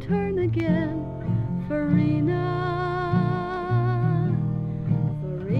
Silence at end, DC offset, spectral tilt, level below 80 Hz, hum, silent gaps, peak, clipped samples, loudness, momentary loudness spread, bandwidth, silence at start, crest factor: 0 s; under 0.1%; -10 dB/octave; -44 dBFS; none; none; -8 dBFS; under 0.1%; -25 LUFS; 5 LU; 5.4 kHz; 0 s; 16 dB